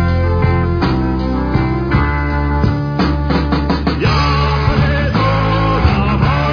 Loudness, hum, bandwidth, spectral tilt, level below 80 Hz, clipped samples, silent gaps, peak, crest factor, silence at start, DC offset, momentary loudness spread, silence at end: -15 LUFS; none; 5.4 kHz; -8 dB/octave; -20 dBFS; under 0.1%; none; -2 dBFS; 12 dB; 0 s; under 0.1%; 3 LU; 0 s